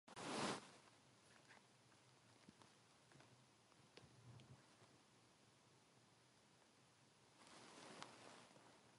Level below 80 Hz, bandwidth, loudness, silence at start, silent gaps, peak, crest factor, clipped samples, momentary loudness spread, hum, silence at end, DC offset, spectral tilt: under -90 dBFS; 11.5 kHz; -54 LUFS; 0.05 s; none; -32 dBFS; 28 dB; under 0.1%; 21 LU; none; 0 s; under 0.1%; -3.5 dB/octave